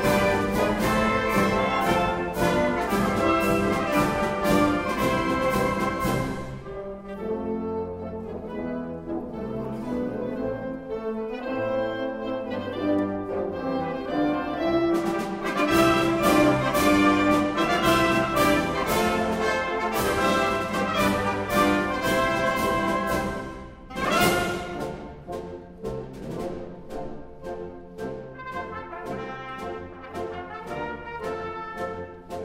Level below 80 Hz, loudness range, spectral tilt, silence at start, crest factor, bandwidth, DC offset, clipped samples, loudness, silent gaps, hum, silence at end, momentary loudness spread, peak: -44 dBFS; 14 LU; -5 dB/octave; 0 s; 18 dB; 16 kHz; under 0.1%; under 0.1%; -25 LUFS; none; none; 0 s; 15 LU; -8 dBFS